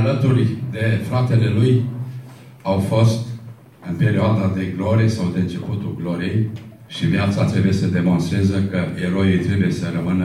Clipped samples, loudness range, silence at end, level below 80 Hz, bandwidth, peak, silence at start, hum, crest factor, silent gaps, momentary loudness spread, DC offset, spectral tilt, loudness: under 0.1%; 2 LU; 0 s; -50 dBFS; 12.5 kHz; -4 dBFS; 0 s; none; 14 dB; none; 11 LU; under 0.1%; -7.5 dB/octave; -19 LUFS